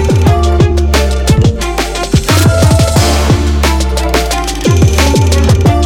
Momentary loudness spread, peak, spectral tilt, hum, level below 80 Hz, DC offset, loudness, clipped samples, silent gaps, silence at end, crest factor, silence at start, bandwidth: 4 LU; 0 dBFS; -5.5 dB/octave; none; -14 dBFS; under 0.1%; -10 LUFS; under 0.1%; none; 0 s; 8 dB; 0 s; 17 kHz